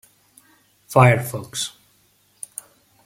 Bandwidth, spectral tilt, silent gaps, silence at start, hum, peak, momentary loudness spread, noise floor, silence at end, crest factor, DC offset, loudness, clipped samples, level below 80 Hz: 16 kHz; -5 dB/octave; none; 0.9 s; 50 Hz at -50 dBFS; 0 dBFS; 21 LU; -60 dBFS; 1.35 s; 22 dB; under 0.1%; -19 LUFS; under 0.1%; -56 dBFS